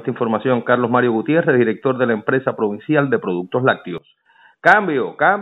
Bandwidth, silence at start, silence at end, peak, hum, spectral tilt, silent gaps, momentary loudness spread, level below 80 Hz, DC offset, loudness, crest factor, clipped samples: 7.6 kHz; 0 s; 0 s; 0 dBFS; none; -8 dB/octave; none; 7 LU; -70 dBFS; under 0.1%; -17 LUFS; 18 dB; under 0.1%